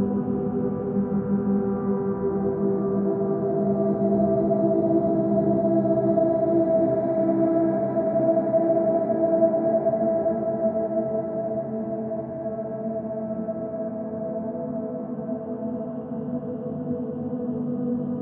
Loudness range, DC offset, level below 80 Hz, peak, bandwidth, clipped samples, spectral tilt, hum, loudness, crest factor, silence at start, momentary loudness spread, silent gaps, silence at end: 9 LU; under 0.1%; -56 dBFS; -8 dBFS; 2.5 kHz; under 0.1%; -12 dB/octave; none; -24 LUFS; 16 dB; 0 s; 9 LU; none; 0 s